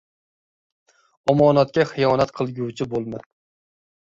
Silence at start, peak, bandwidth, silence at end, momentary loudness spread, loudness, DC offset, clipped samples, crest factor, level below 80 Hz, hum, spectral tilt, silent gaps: 1.25 s; -4 dBFS; 7.8 kHz; 0.85 s; 12 LU; -20 LUFS; under 0.1%; under 0.1%; 20 dB; -56 dBFS; none; -7 dB/octave; none